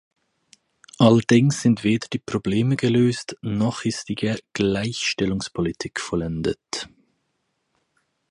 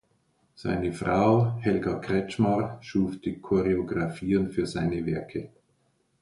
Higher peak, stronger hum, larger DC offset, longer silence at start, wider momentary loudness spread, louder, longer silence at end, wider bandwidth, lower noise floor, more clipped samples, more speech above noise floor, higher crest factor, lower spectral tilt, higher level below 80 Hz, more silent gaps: first, -2 dBFS vs -10 dBFS; neither; neither; first, 1 s vs 0.6 s; about the same, 11 LU vs 9 LU; first, -22 LUFS vs -27 LUFS; first, 1.45 s vs 0.75 s; about the same, 11.5 kHz vs 11.5 kHz; about the same, -73 dBFS vs -70 dBFS; neither; first, 52 dB vs 44 dB; about the same, 20 dB vs 18 dB; second, -5.5 dB/octave vs -8 dB/octave; about the same, -50 dBFS vs -50 dBFS; neither